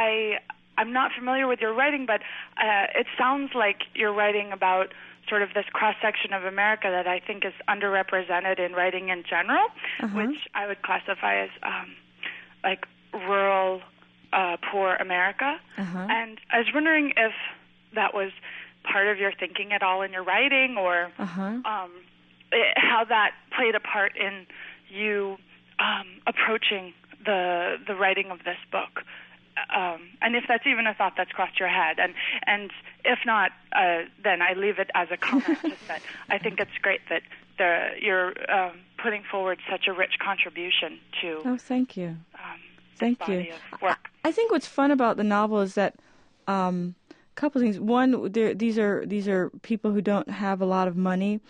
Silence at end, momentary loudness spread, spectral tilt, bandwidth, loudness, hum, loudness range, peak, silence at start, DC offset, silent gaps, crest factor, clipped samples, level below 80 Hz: 0.1 s; 11 LU; -5.5 dB/octave; 9.8 kHz; -25 LUFS; 60 Hz at -65 dBFS; 3 LU; -8 dBFS; 0 s; under 0.1%; none; 18 dB; under 0.1%; -74 dBFS